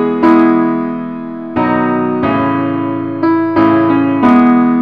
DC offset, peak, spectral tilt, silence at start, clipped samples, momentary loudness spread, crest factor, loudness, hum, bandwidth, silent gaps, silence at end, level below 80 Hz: 0.5%; 0 dBFS; -9 dB/octave; 0 s; under 0.1%; 10 LU; 12 dB; -12 LUFS; none; 5 kHz; none; 0 s; -46 dBFS